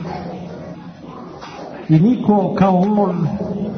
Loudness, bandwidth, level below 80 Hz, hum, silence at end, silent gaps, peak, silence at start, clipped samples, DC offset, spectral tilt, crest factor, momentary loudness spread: -16 LUFS; 6.4 kHz; -48 dBFS; none; 0 s; none; -4 dBFS; 0 s; under 0.1%; under 0.1%; -9.5 dB/octave; 14 dB; 20 LU